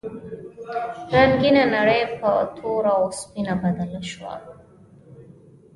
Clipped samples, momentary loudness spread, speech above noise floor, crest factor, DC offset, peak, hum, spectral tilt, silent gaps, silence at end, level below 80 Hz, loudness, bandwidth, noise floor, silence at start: under 0.1%; 19 LU; 28 dB; 20 dB; under 0.1%; -4 dBFS; none; -5.5 dB/octave; none; 0.5 s; -50 dBFS; -21 LUFS; 11.5 kHz; -49 dBFS; 0.05 s